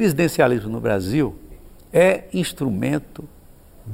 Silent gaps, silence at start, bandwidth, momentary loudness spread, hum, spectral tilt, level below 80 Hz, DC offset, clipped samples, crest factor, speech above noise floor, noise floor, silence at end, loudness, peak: none; 0 s; 16 kHz; 10 LU; none; -6 dB/octave; -46 dBFS; under 0.1%; under 0.1%; 18 dB; 26 dB; -46 dBFS; 0 s; -20 LUFS; -4 dBFS